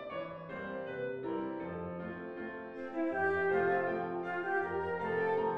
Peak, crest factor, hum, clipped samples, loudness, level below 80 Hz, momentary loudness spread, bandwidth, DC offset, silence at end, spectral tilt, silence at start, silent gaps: -20 dBFS; 14 dB; none; under 0.1%; -36 LUFS; -68 dBFS; 12 LU; 5.8 kHz; under 0.1%; 0 s; -8 dB/octave; 0 s; none